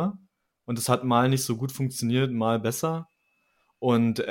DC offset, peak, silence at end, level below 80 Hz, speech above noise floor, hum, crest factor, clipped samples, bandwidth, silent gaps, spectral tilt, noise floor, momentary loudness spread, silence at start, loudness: under 0.1%; -8 dBFS; 0 s; -66 dBFS; 46 dB; none; 20 dB; under 0.1%; 17 kHz; none; -5.5 dB/octave; -71 dBFS; 8 LU; 0 s; -26 LUFS